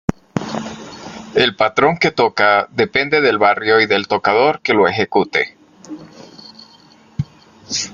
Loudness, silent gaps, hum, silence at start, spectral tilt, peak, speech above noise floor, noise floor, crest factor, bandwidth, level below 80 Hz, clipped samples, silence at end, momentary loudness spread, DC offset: -15 LUFS; none; none; 0.1 s; -4 dB/octave; 0 dBFS; 32 dB; -47 dBFS; 18 dB; 7.4 kHz; -50 dBFS; under 0.1%; 0 s; 18 LU; under 0.1%